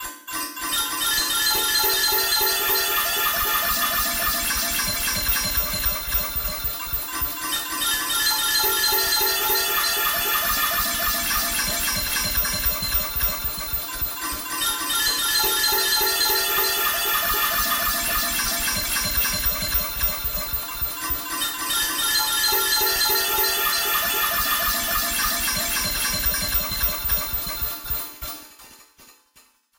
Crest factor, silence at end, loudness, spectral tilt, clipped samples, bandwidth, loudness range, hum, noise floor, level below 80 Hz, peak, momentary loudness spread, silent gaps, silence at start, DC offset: 16 dB; 0.65 s; -20 LUFS; -0.5 dB/octave; under 0.1%; 16.5 kHz; 3 LU; none; -57 dBFS; -38 dBFS; -8 dBFS; 7 LU; none; 0 s; under 0.1%